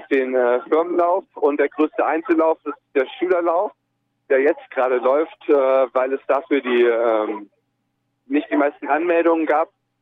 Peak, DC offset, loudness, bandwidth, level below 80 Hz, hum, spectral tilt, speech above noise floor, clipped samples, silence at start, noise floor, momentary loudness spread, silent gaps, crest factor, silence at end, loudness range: -6 dBFS; under 0.1%; -19 LUFS; 4.3 kHz; -74 dBFS; none; -6.5 dB/octave; 53 dB; under 0.1%; 0 s; -72 dBFS; 6 LU; none; 12 dB; 0.35 s; 2 LU